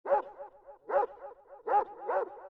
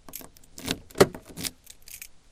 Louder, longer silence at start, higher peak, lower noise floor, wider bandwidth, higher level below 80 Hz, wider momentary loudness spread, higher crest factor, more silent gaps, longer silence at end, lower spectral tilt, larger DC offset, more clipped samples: second, -32 LUFS vs -27 LUFS; about the same, 0.05 s vs 0.05 s; second, -16 dBFS vs -2 dBFS; about the same, -50 dBFS vs -47 dBFS; second, 4.6 kHz vs 16 kHz; second, -72 dBFS vs -52 dBFS; about the same, 19 LU vs 21 LU; second, 16 dB vs 28 dB; neither; second, 0.05 s vs 0.2 s; first, -6 dB/octave vs -4 dB/octave; neither; neither